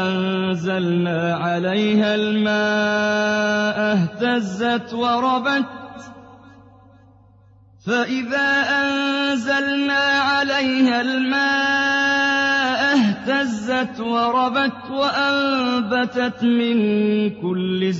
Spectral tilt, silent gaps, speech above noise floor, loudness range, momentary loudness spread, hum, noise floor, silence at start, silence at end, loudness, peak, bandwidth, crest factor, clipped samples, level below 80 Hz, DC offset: -5 dB/octave; none; 31 dB; 6 LU; 5 LU; none; -50 dBFS; 0 s; 0 s; -19 LUFS; -6 dBFS; 8 kHz; 12 dB; under 0.1%; -62 dBFS; under 0.1%